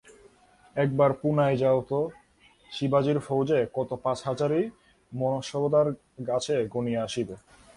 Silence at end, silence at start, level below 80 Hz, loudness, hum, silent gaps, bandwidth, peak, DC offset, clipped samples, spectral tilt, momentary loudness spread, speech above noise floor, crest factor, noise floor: 0.4 s; 0.75 s; -62 dBFS; -27 LUFS; none; none; 11.5 kHz; -10 dBFS; under 0.1%; under 0.1%; -6.5 dB/octave; 11 LU; 33 dB; 18 dB; -59 dBFS